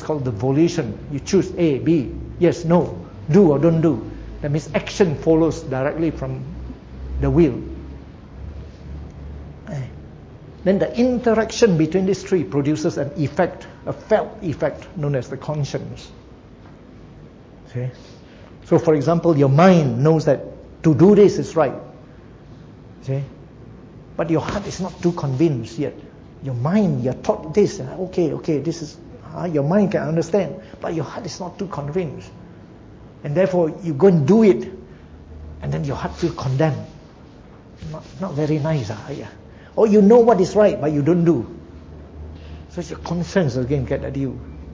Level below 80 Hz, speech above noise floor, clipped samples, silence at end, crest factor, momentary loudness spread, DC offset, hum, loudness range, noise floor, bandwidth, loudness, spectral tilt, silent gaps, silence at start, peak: -40 dBFS; 25 dB; under 0.1%; 0 s; 18 dB; 21 LU; under 0.1%; none; 9 LU; -43 dBFS; 7.8 kHz; -19 LUFS; -7.5 dB/octave; none; 0 s; -2 dBFS